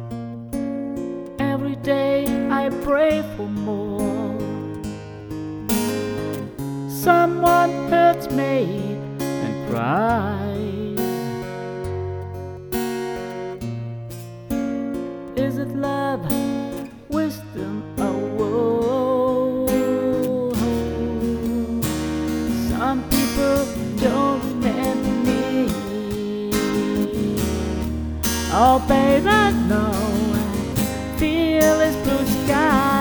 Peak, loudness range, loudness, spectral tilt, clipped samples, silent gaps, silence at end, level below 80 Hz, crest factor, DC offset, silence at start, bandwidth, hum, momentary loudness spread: -2 dBFS; 8 LU; -22 LUFS; -5.5 dB/octave; under 0.1%; none; 0 s; -38 dBFS; 20 dB; under 0.1%; 0 s; over 20 kHz; none; 13 LU